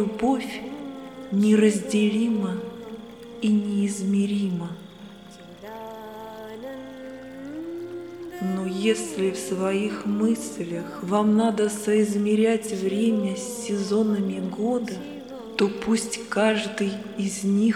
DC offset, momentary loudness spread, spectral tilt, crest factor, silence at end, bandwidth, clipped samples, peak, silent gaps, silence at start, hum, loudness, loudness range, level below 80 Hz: under 0.1%; 17 LU; -5.5 dB/octave; 18 dB; 0 s; 13.5 kHz; under 0.1%; -8 dBFS; none; 0 s; none; -24 LUFS; 11 LU; -64 dBFS